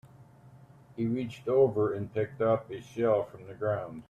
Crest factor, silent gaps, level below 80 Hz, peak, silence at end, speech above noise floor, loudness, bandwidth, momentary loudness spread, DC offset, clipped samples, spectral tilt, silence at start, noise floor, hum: 16 dB; none; -66 dBFS; -14 dBFS; 0.05 s; 25 dB; -30 LUFS; 9 kHz; 10 LU; under 0.1%; under 0.1%; -8.5 dB/octave; 0.2 s; -55 dBFS; none